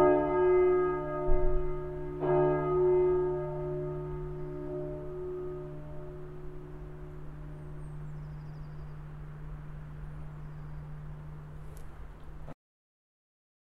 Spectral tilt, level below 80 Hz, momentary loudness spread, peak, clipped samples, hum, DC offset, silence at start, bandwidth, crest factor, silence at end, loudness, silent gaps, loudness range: -10 dB/octave; -40 dBFS; 20 LU; -14 dBFS; under 0.1%; none; under 0.1%; 0 s; 3.5 kHz; 18 dB; 1.1 s; -31 LUFS; none; 17 LU